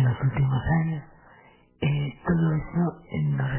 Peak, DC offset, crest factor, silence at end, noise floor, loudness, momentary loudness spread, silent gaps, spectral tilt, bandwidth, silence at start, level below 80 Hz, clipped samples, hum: -12 dBFS; under 0.1%; 14 dB; 0 s; -55 dBFS; -26 LUFS; 6 LU; none; -12 dB/octave; 3.2 kHz; 0 s; -44 dBFS; under 0.1%; none